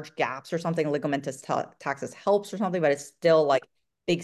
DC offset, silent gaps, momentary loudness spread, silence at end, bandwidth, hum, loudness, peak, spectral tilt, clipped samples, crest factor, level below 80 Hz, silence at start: under 0.1%; none; 10 LU; 0 s; 12.5 kHz; none; -27 LUFS; -10 dBFS; -5.5 dB/octave; under 0.1%; 16 dB; -72 dBFS; 0 s